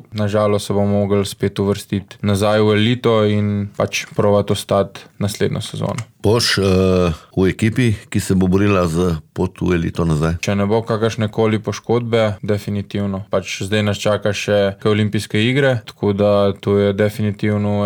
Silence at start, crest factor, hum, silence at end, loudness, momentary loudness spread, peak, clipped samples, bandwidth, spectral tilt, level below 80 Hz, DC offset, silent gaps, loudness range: 0.1 s; 14 dB; none; 0 s; -18 LUFS; 7 LU; -4 dBFS; under 0.1%; 18.5 kHz; -6 dB/octave; -42 dBFS; under 0.1%; none; 2 LU